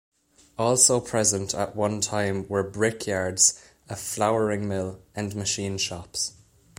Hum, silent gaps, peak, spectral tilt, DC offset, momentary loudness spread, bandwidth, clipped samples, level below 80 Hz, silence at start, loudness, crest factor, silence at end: none; none; -2 dBFS; -3 dB/octave; under 0.1%; 14 LU; 16.5 kHz; under 0.1%; -58 dBFS; 0.6 s; -24 LUFS; 24 dB; 0.45 s